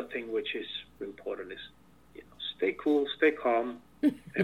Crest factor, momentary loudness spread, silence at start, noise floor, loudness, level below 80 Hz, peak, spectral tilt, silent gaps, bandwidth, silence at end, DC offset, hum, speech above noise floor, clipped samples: 20 dB; 15 LU; 0 s; -54 dBFS; -31 LUFS; -66 dBFS; -12 dBFS; -6 dB/octave; none; 12 kHz; 0 s; under 0.1%; none; 23 dB; under 0.1%